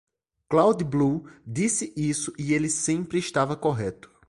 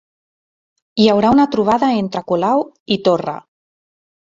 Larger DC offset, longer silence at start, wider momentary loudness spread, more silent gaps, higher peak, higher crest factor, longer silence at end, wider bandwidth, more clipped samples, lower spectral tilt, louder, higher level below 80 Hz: neither; second, 0.5 s vs 0.95 s; about the same, 8 LU vs 10 LU; second, none vs 2.80-2.86 s; second, -6 dBFS vs -2 dBFS; about the same, 20 dB vs 16 dB; second, 0.35 s vs 0.95 s; first, 11.5 kHz vs 7.6 kHz; neither; second, -5 dB/octave vs -6.5 dB/octave; second, -25 LUFS vs -16 LUFS; about the same, -56 dBFS vs -54 dBFS